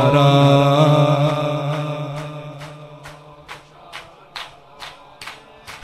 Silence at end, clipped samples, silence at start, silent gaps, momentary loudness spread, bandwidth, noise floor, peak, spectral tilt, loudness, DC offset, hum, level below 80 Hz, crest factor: 0.05 s; under 0.1%; 0 s; none; 25 LU; 12 kHz; -40 dBFS; 0 dBFS; -7 dB/octave; -16 LUFS; under 0.1%; none; -52 dBFS; 18 dB